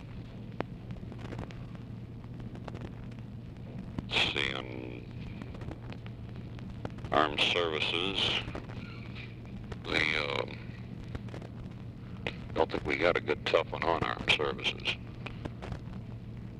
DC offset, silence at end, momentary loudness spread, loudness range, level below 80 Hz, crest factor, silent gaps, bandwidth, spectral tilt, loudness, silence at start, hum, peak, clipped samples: under 0.1%; 0 s; 16 LU; 6 LU; -50 dBFS; 24 dB; none; 12 kHz; -5 dB/octave; -33 LUFS; 0 s; none; -10 dBFS; under 0.1%